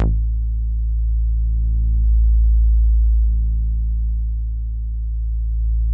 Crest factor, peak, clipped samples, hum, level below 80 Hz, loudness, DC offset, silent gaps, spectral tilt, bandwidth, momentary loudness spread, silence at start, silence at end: 10 dB; -6 dBFS; under 0.1%; 50 Hz at -60 dBFS; -16 dBFS; -21 LUFS; under 0.1%; none; -12 dB/octave; 0.9 kHz; 8 LU; 0 s; 0 s